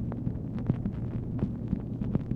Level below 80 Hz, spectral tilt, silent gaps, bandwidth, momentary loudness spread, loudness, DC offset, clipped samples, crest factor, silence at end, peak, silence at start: -42 dBFS; -11.5 dB/octave; none; 4.1 kHz; 3 LU; -33 LUFS; under 0.1%; under 0.1%; 18 dB; 0 s; -14 dBFS; 0 s